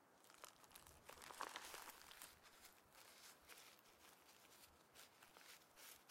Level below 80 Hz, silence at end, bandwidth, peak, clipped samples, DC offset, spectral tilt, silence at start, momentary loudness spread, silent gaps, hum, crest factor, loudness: -84 dBFS; 0 s; 16 kHz; -32 dBFS; under 0.1%; under 0.1%; -0.5 dB/octave; 0 s; 12 LU; none; none; 30 dB; -61 LUFS